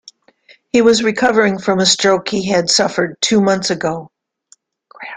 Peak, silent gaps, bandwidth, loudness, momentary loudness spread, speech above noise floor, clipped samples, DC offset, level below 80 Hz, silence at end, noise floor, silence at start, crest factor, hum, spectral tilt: 0 dBFS; none; 9.6 kHz; -14 LUFS; 7 LU; 39 dB; under 0.1%; under 0.1%; -54 dBFS; 0 s; -53 dBFS; 0.75 s; 16 dB; none; -3.5 dB/octave